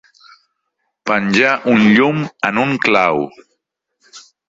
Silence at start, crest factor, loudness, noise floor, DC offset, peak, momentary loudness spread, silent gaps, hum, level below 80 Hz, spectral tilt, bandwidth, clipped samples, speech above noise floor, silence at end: 1.05 s; 16 dB; -14 LUFS; -72 dBFS; under 0.1%; 0 dBFS; 9 LU; none; none; -58 dBFS; -6 dB/octave; 7.8 kHz; under 0.1%; 58 dB; 0.3 s